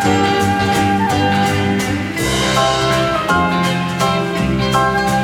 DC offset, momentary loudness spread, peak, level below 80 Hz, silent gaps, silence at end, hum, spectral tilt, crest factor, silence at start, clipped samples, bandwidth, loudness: under 0.1%; 3 LU; -2 dBFS; -34 dBFS; none; 0 s; none; -4.5 dB/octave; 14 dB; 0 s; under 0.1%; 18 kHz; -15 LUFS